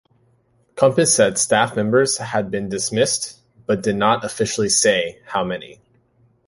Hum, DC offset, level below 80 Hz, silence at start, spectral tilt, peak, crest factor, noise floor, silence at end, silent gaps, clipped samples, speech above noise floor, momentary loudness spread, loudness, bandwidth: none; under 0.1%; -54 dBFS; 0.75 s; -3 dB/octave; 0 dBFS; 20 dB; -60 dBFS; 0.75 s; none; under 0.1%; 42 dB; 10 LU; -18 LUFS; 11.5 kHz